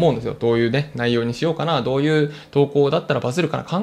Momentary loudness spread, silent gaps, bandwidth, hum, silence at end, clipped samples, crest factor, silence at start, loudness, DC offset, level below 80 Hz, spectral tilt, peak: 4 LU; none; 12.5 kHz; none; 0 s; under 0.1%; 16 dB; 0 s; -20 LUFS; under 0.1%; -52 dBFS; -7 dB/octave; -4 dBFS